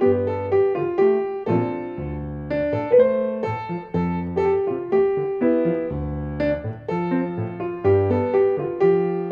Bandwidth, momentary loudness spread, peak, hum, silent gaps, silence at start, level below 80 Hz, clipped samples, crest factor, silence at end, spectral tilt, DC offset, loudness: 5.2 kHz; 9 LU; -6 dBFS; none; none; 0 s; -44 dBFS; under 0.1%; 16 dB; 0 s; -10 dB/octave; under 0.1%; -22 LUFS